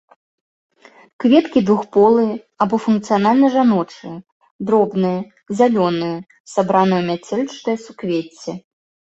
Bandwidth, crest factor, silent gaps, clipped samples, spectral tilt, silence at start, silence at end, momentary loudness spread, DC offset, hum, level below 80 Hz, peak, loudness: 8.2 kHz; 16 dB; 4.32-4.40 s, 4.51-4.59 s, 6.40-6.45 s; under 0.1%; -7 dB/octave; 1.2 s; 0.6 s; 16 LU; under 0.1%; none; -60 dBFS; -2 dBFS; -17 LUFS